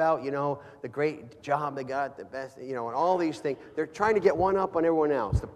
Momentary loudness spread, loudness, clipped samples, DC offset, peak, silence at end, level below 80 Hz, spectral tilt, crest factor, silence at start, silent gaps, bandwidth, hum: 13 LU; -28 LUFS; under 0.1%; under 0.1%; -10 dBFS; 0 s; -46 dBFS; -7 dB/octave; 18 dB; 0 s; none; 11 kHz; none